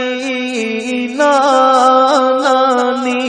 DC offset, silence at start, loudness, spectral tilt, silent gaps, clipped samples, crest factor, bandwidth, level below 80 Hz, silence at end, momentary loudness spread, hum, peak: under 0.1%; 0 s; -12 LUFS; -2.5 dB/octave; none; under 0.1%; 12 dB; 10 kHz; -60 dBFS; 0 s; 9 LU; none; 0 dBFS